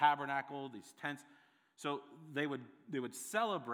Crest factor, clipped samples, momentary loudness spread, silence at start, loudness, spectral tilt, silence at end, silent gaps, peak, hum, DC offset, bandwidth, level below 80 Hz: 24 dB; under 0.1%; 10 LU; 0 s; -41 LUFS; -4 dB/octave; 0 s; none; -16 dBFS; none; under 0.1%; over 20 kHz; under -90 dBFS